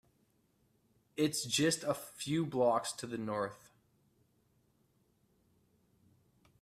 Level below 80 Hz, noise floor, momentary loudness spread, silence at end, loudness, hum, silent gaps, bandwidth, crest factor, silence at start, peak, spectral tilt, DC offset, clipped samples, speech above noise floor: -76 dBFS; -74 dBFS; 9 LU; 3.05 s; -35 LUFS; none; none; 15.5 kHz; 20 dB; 1.15 s; -18 dBFS; -4 dB/octave; under 0.1%; under 0.1%; 40 dB